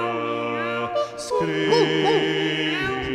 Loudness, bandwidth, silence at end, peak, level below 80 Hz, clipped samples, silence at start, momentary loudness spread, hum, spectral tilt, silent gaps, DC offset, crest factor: -22 LUFS; 13 kHz; 0 s; -6 dBFS; -52 dBFS; under 0.1%; 0 s; 7 LU; none; -4.5 dB/octave; none; under 0.1%; 16 dB